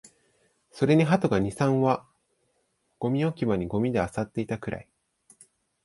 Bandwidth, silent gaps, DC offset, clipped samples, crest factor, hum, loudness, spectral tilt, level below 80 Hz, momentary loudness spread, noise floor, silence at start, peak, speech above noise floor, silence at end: 11.5 kHz; none; under 0.1%; under 0.1%; 20 dB; none; -26 LUFS; -7.5 dB/octave; -54 dBFS; 11 LU; -73 dBFS; 0.75 s; -8 dBFS; 48 dB; 1.05 s